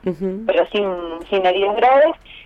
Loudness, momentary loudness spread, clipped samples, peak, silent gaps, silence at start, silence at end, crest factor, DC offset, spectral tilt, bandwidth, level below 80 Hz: -17 LUFS; 10 LU; under 0.1%; -4 dBFS; none; 0.05 s; 0.05 s; 14 dB; under 0.1%; -7 dB/octave; 6.4 kHz; -50 dBFS